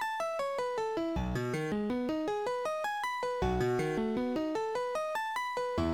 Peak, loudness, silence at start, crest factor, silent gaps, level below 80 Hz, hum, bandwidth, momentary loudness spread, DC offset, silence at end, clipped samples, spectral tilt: -20 dBFS; -33 LUFS; 0 s; 14 dB; none; -48 dBFS; none; 18.5 kHz; 3 LU; under 0.1%; 0 s; under 0.1%; -6 dB/octave